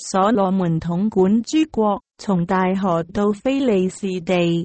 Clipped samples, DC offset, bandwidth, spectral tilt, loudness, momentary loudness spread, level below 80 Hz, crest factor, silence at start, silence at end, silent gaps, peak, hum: under 0.1%; under 0.1%; 8.8 kHz; -6.5 dB/octave; -19 LUFS; 5 LU; -50 dBFS; 14 dB; 0 s; 0 s; none; -6 dBFS; none